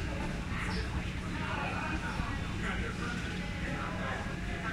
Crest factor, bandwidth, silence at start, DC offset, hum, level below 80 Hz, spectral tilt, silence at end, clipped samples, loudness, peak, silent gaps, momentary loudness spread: 16 dB; 15 kHz; 0 s; under 0.1%; none; -42 dBFS; -5.5 dB/octave; 0 s; under 0.1%; -36 LUFS; -20 dBFS; none; 3 LU